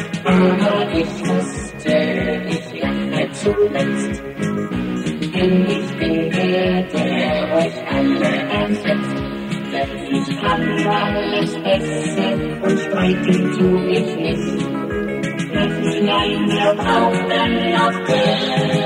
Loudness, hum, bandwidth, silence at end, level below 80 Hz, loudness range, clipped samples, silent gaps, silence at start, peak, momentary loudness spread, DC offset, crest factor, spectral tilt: -18 LUFS; none; 12 kHz; 0 s; -42 dBFS; 3 LU; under 0.1%; none; 0 s; -2 dBFS; 7 LU; under 0.1%; 16 dB; -6 dB/octave